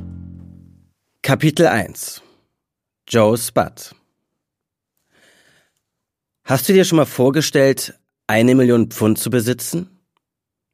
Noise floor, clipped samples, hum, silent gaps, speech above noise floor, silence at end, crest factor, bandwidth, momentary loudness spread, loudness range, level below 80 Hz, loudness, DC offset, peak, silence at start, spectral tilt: -82 dBFS; under 0.1%; none; none; 67 dB; 0.9 s; 18 dB; 15.5 kHz; 18 LU; 7 LU; -54 dBFS; -16 LUFS; under 0.1%; 0 dBFS; 0 s; -5 dB/octave